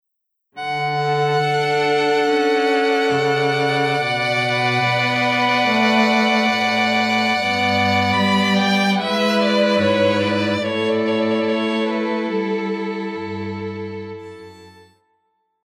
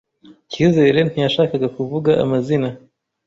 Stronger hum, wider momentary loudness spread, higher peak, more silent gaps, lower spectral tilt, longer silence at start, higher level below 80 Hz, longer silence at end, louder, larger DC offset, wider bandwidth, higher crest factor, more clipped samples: neither; about the same, 10 LU vs 8 LU; about the same, -4 dBFS vs -2 dBFS; neither; second, -5 dB/octave vs -7 dB/octave; about the same, 0.55 s vs 0.5 s; second, -68 dBFS vs -52 dBFS; first, 0.95 s vs 0.5 s; about the same, -18 LUFS vs -17 LUFS; neither; first, 14.5 kHz vs 7.8 kHz; about the same, 16 dB vs 16 dB; neither